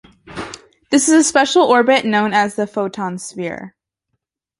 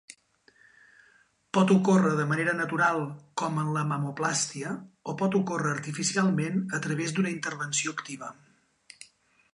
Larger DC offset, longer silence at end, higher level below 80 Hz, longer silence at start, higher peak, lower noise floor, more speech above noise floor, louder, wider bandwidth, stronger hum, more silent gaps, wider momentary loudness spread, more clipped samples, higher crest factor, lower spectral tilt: neither; first, 0.9 s vs 0.5 s; first, -58 dBFS vs -74 dBFS; second, 0.25 s vs 1.55 s; first, 0 dBFS vs -10 dBFS; first, -74 dBFS vs -63 dBFS; first, 59 dB vs 36 dB; first, -15 LUFS vs -27 LUFS; about the same, 11.5 kHz vs 11 kHz; neither; neither; first, 18 LU vs 15 LU; neither; about the same, 16 dB vs 18 dB; second, -3 dB/octave vs -5 dB/octave